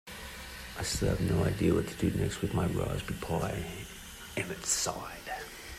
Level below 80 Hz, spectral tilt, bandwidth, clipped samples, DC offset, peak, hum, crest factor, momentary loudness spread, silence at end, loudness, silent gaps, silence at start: -46 dBFS; -4.5 dB/octave; 16 kHz; under 0.1%; under 0.1%; -14 dBFS; none; 18 dB; 13 LU; 0 s; -33 LUFS; none; 0.05 s